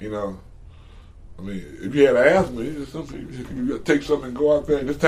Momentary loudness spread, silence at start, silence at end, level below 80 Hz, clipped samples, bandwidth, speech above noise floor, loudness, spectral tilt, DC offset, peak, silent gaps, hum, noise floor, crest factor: 18 LU; 0 s; 0 s; -44 dBFS; under 0.1%; 13 kHz; 23 dB; -21 LUFS; -6 dB/octave; under 0.1%; -2 dBFS; none; none; -44 dBFS; 20 dB